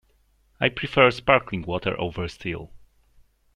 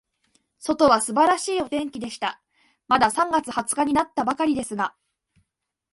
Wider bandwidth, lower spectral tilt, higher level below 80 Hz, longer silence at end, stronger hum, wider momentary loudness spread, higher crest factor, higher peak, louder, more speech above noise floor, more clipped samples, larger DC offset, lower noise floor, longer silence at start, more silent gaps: second, 10.5 kHz vs 12 kHz; first, -6 dB/octave vs -3 dB/octave; first, -48 dBFS vs -58 dBFS; second, 0.8 s vs 1.05 s; neither; first, 14 LU vs 11 LU; about the same, 24 dB vs 20 dB; about the same, -2 dBFS vs -4 dBFS; about the same, -23 LUFS vs -22 LUFS; second, 40 dB vs 56 dB; neither; neither; second, -63 dBFS vs -78 dBFS; about the same, 0.6 s vs 0.6 s; neither